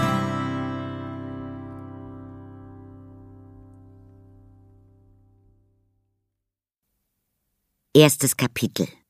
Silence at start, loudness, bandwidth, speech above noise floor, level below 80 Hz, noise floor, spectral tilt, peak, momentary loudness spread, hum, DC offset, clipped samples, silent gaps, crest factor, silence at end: 0 s; -22 LUFS; 15.5 kHz; 65 dB; -60 dBFS; -85 dBFS; -4.5 dB/octave; 0 dBFS; 28 LU; none; under 0.1%; under 0.1%; 6.78-6.82 s; 26 dB; 0.2 s